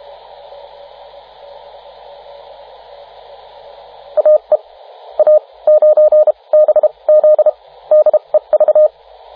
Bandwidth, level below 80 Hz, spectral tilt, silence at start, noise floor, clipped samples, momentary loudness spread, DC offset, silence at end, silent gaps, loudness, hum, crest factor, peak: 4.6 kHz; -62 dBFS; -6 dB/octave; 4.15 s; -38 dBFS; under 0.1%; 6 LU; under 0.1%; 0.45 s; none; -11 LUFS; none; 12 dB; -2 dBFS